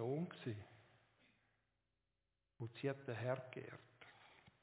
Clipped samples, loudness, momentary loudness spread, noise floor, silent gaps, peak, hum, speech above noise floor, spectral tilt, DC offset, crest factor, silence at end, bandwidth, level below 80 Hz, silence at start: under 0.1%; -47 LUFS; 19 LU; -90 dBFS; none; -28 dBFS; none; 44 dB; -6.5 dB/octave; under 0.1%; 22 dB; 0.15 s; 4 kHz; -82 dBFS; 0 s